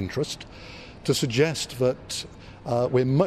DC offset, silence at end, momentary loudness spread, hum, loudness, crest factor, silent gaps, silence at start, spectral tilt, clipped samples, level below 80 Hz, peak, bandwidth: under 0.1%; 0 s; 18 LU; none; -26 LUFS; 16 dB; none; 0 s; -5 dB/octave; under 0.1%; -52 dBFS; -10 dBFS; 14.5 kHz